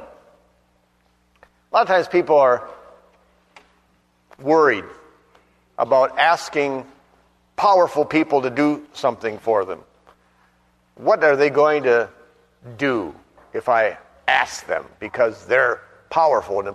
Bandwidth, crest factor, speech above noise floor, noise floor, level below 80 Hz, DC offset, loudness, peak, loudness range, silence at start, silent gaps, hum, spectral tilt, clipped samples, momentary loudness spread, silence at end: 12.5 kHz; 20 dB; 43 dB; -62 dBFS; -62 dBFS; under 0.1%; -19 LUFS; -2 dBFS; 3 LU; 0 s; none; 60 Hz at -65 dBFS; -5 dB/octave; under 0.1%; 14 LU; 0 s